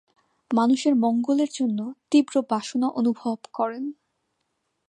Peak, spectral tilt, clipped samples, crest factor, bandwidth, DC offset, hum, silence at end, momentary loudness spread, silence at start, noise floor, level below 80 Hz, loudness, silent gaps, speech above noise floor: -8 dBFS; -5 dB/octave; under 0.1%; 16 dB; 10 kHz; under 0.1%; none; 0.95 s; 9 LU; 0.5 s; -76 dBFS; -80 dBFS; -24 LUFS; none; 53 dB